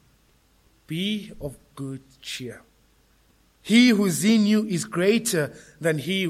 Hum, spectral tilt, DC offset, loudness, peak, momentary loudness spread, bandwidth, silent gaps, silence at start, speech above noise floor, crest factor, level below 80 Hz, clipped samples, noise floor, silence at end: none; -4.5 dB/octave; under 0.1%; -22 LUFS; -6 dBFS; 20 LU; 15.5 kHz; none; 0.9 s; 38 dB; 18 dB; -58 dBFS; under 0.1%; -61 dBFS; 0 s